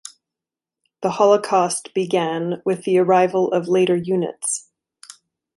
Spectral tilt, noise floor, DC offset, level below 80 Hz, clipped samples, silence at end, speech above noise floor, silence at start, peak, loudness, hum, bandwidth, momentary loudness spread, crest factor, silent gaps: -5 dB/octave; -88 dBFS; under 0.1%; -68 dBFS; under 0.1%; 0.95 s; 69 dB; 1 s; -2 dBFS; -19 LUFS; none; 11.5 kHz; 8 LU; 18 dB; none